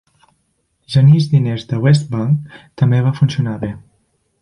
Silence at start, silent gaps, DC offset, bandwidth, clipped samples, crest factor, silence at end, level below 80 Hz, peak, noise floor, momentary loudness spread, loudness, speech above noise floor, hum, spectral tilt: 0.9 s; none; under 0.1%; 10.5 kHz; under 0.1%; 14 dB; 0.65 s; -50 dBFS; -2 dBFS; -65 dBFS; 14 LU; -15 LUFS; 51 dB; none; -8 dB/octave